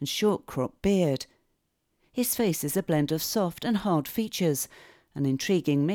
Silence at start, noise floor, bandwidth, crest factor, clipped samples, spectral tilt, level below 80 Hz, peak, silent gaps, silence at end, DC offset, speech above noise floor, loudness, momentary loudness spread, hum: 0 s; -75 dBFS; over 20 kHz; 16 dB; under 0.1%; -5 dB/octave; -56 dBFS; -12 dBFS; none; 0 s; under 0.1%; 49 dB; -27 LUFS; 8 LU; none